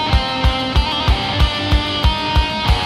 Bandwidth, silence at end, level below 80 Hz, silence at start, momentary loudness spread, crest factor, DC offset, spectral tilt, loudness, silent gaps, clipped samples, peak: 13 kHz; 0 s; -18 dBFS; 0 s; 1 LU; 14 dB; under 0.1%; -5.5 dB/octave; -17 LUFS; none; under 0.1%; -2 dBFS